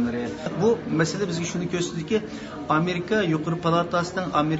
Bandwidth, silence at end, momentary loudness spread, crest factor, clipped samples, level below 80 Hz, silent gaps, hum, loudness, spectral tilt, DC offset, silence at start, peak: 8 kHz; 0 s; 5 LU; 18 dB; under 0.1%; -54 dBFS; none; none; -25 LUFS; -5.5 dB/octave; under 0.1%; 0 s; -6 dBFS